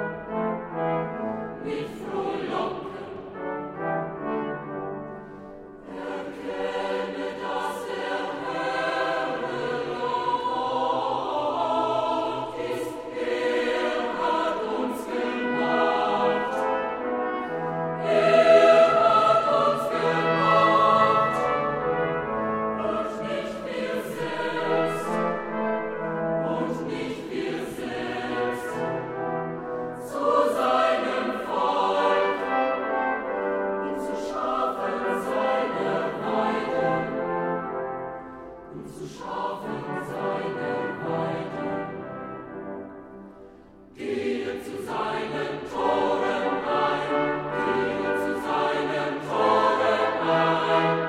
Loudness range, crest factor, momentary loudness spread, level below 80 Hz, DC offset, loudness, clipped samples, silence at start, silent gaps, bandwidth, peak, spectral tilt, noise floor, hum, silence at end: 12 LU; 20 dB; 12 LU; -60 dBFS; under 0.1%; -25 LUFS; under 0.1%; 0 s; none; 15 kHz; -6 dBFS; -5.5 dB/octave; -49 dBFS; none; 0 s